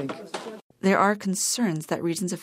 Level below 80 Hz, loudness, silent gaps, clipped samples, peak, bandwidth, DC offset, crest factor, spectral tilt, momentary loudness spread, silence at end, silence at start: -74 dBFS; -24 LUFS; 0.62-0.70 s; under 0.1%; -6 dBFS; 16 kHz; under 0.1%; 20 dB; -4 dB/octave; 15 LU; 0 s; 0 s